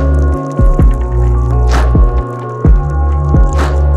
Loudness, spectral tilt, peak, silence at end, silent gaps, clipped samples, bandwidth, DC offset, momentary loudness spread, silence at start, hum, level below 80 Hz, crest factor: -12 LUFS; -8 dB/octave; 0 dBFS; 0 s; none; under 0.1%; 8.2 kHz; under 0.1%; 3 LU; 0 s; none; -10 dBFS; 8 dB